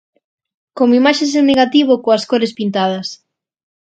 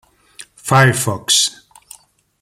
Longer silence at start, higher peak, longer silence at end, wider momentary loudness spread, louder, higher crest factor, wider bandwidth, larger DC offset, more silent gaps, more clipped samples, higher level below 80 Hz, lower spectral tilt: first, 0.75 s vs 0.4 s; about the same, 0 dBFS vs 0 dBFS; about the same, 0.85 s vs 0.9 s; about the same, 7 LU vs 7 LU; about the same, -14 LUFS vs -14 LUFS; about the same, 14 dB vs 18 dB; second, 9 kHz vs 15.5 kHz; neither; neither; neither; second, -58 dBFS vs -52 dBFS; first, -4.5 dB/octave vs -3 dB/octave